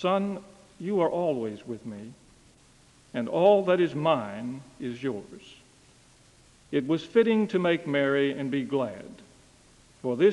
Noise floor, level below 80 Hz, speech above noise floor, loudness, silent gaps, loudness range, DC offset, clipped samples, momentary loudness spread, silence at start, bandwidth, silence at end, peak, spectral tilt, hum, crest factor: -58 dBFS; -66 dBFS; 32 dB; -27 LUFS; none; 5 LU; under 0.1%; under 0.1%; 17 LU; 0 s; 11.5 kHz; 0 s; -8 dBFS; -7 dB/octave; none; 20 dB